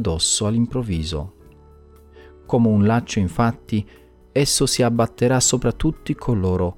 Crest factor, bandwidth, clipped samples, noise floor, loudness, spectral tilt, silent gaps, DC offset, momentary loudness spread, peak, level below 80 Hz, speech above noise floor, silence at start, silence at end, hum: 16 dB; 17 kHz; under 0.1%; -47 dBFS; -20 LUFS; -4.5 dB/octave; none; under 0.1%; 10 LU; -4 dBFS; -38 dBFS; 28 dB; 0 s; 0.05 s; none